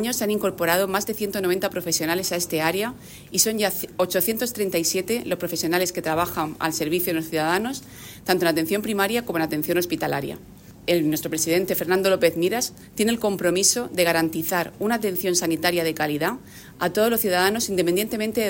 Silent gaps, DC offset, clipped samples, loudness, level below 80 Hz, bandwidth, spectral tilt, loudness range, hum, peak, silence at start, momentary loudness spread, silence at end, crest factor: none; under 0.1%; under 0.1%; -23 LUFS; -56 dBFS; 16.5 kHz; -3.5 dB/octave; 3 LU; none; -4 dBFS; 0 s; 6 LU; 0 s; 20 dB